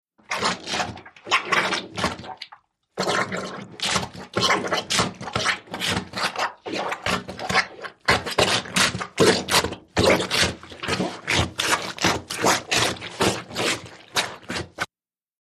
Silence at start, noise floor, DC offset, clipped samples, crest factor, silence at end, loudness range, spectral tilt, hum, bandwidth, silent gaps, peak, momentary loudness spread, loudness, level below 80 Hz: 0.3 s; under -90 dBFS; under 0.1%; under 0.1%; 22 dB; 0.55 s; 5 LU; -2.5 dB/octave; none; 15 kHz; none; -4 dBFS; 12 LU; -23 LUFS; -48 dBFS